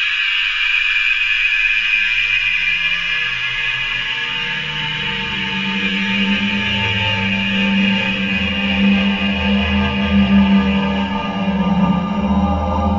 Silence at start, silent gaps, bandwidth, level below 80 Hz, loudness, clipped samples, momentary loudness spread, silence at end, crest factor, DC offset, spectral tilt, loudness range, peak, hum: 0 s; none; 7.6 kHz; -32 dBFS; -16 LUFS; under 0.1%; 6 LU; 0 s; 14 dB; 0.2%; -5.5 dB/octave; 4 LU; -2 dBFS; none